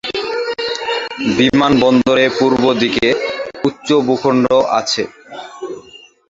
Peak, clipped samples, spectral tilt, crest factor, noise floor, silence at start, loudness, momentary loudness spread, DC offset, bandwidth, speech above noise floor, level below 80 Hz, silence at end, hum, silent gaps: 0 dBFS; under 0.1%; -4.5 dB/octave; 14 dB; -41 dBFS; 0.05 s; -14 LUFS; 17 LU; under 0.1%; 7.8 kHz; 28 dB; -48 dBFS; 0.35 s; none; none